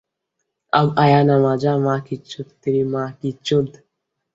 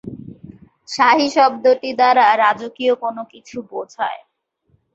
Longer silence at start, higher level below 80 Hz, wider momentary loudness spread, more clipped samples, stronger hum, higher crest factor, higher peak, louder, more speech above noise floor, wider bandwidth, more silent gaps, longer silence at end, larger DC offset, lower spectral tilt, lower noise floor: first, 0.75 s vs 0.05 s; first, -56 dBFS vs -62 dBFS; second, 15 LU vs 20 LU; neither; neither; about the same, 18 dB vs 16 dB; about the same, -2 dBFS vs -2 dBFS; about the same, -18 LUFS vs -16 LUFS; first, 59 dB vs 46 dB; about the same, 7.8 kHz vs 8 kHz; neither; second, 0.65 s vs 0.8 s; neither; first, -7.5 dB/octave vs -3.5 dB/octave; first, -77 dBFS vs -63 dBFS